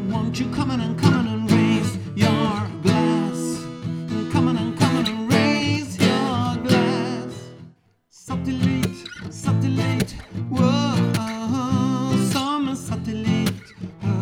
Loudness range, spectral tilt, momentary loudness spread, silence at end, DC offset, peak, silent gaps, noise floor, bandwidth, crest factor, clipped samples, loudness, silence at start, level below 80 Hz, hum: 4 LU; -6 dB/octave; 10 LU; 0 s; under 0.1%; -2 dBFS; none; -55 dBFS; 17 kHz; 18 dB; under 0.1%; -22 LUFS; 0 s; -50 dBFS; none